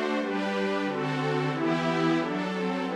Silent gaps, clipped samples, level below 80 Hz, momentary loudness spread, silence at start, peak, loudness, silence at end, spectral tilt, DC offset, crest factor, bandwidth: none; under 0.1%; -72 dBFS; 4 LU; 0 s; -14 dBFS; -28 LUFS; 0 s; -6.5 dB/octave; under 0.1%; 14 dB; 11.5 kHz